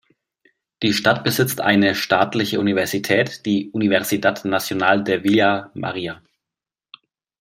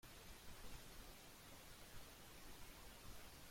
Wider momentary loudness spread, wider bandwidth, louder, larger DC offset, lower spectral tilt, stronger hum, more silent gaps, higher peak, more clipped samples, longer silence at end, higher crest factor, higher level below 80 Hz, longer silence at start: first, 9 LU vs 1 LU; about the same, 16 kHz vs 16.5 kHz; first, -19 LUFS vs -60 LUFS; neither; first, -4.5 dB/octave vs -3 dB/octave; neither; neither; first, -2 dBFS vs -44 dBFS; neither; first, 1.25 s vs 0 s; about the same, 18 dB vs 14 dB; about the same, -60 dBFS vs -64 dBFS; first, 0.8 s vs 0.05 s